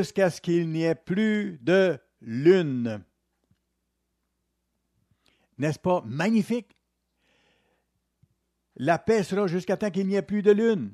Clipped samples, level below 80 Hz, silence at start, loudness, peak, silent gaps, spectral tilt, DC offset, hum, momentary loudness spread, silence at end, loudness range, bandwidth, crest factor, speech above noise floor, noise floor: under 0.1%; -66 dBFS; 0 s; -25 LUFS; -8 dBFS; none; -7 dB/octave; under 0.1%; none; 10 LU; 0 s; 6 LU; 13 kHz; 18 dB; 54 dB; -78 dBFS